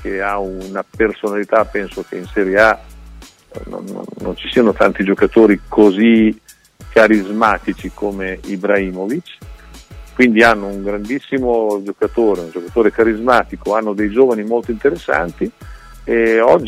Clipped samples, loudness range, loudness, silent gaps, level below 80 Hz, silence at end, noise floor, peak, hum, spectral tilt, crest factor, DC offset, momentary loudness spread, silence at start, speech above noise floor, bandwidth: under 0.1%; 5 LU; -15 LUFS; none; -38 dBFS; 0 s; -38 dBFS; 0 dBFS; none; -6 dB/octave; 16 dB; under 0.1%; 14 LU; 0 s; 24 dB; 15 kHz